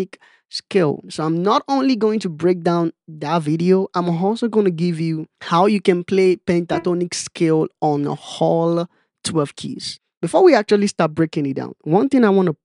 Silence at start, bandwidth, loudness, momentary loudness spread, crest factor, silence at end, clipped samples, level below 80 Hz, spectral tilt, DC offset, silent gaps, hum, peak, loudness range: 0 s; 11.5 kHz; -18 LUFS; 13 LU; 16 dB; 0.1 s; under 0.1%; -64 dBFS; -6 dB/octave; under 0.1%; 10.17-10.21 s; none; -2 dBFS; 2 LU